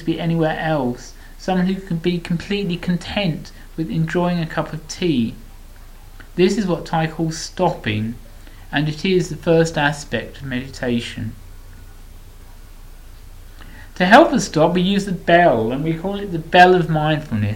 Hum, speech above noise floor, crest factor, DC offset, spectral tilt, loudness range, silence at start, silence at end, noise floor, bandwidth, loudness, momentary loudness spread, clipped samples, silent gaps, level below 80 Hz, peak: none; 20 dB; 20 dB; under 0.1%; -6 dB/octave; 9 LU; 0 s; 0 s; -38 dBFS; 16.5 kHz; -18 LUFS; 15 LU; under 0.1%; none; -38 dBFS; 0 dBFS